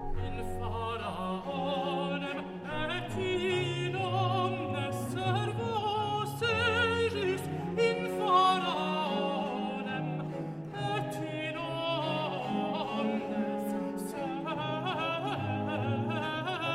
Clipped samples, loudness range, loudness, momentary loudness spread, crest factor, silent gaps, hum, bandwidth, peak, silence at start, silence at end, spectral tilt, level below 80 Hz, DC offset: under 0.1%; 5 LU; -32 LUFS; 8 LU; 18 dB; none; none; 16 kHz; -14 dBFS; 0 s; 0 s; -6 dB/octave; -50 dBFS; under 0.1%